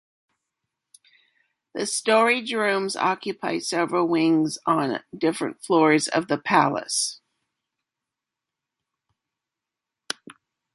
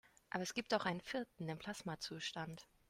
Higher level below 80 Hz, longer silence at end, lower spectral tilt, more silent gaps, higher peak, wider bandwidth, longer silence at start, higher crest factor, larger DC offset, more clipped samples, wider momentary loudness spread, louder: about the same, -72 dBFS vs -74 dBFS; first, 3.6 s vs 0.25 s; about the same, -3.5 dB/octave vs -4 dB/octave; neither; first, -4 dBFS vs -20 dBFS; second, 11.5 kHz vs 16 kHz; first, 1.75 s vs 0.3 s; about the same, 22 dB vs 24 dB; neither; neither; first, 11 LU vs 8 LU; first, -23 LUFS vs -43 LUFS